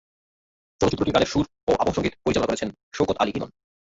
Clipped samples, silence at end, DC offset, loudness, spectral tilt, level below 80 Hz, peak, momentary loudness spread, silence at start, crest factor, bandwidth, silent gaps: under 0.1%; 0.35 s; under 0.1%; -24 LUFS; -5.5 dB/octave; -46 dBFS; -6 dBFS; 8 LU; 0.8 s; 20 dB; 8 kHz; 1.63-1.67 s, 2.83-2.91 s